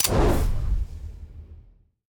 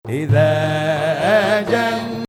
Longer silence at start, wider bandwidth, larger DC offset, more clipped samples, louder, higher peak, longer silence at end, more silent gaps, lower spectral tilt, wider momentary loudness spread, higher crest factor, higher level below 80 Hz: about the same, 0 s vs 0.05 s; first, 19.5 kHz vs 15.5 kHz; neither; neither; second, -26 LUFS vs -17 LUFS; about the same, -6 dBFS vs -4 dBFS; first, 0.5 s vs 0.05 s; neither; second, -4.5 dB/octave vs -6.5 dB/octave; first, 23 LU vs 4 LU; about the same, 18 dB vs 14 dB; first, -28 dBFS vs -52 dBFS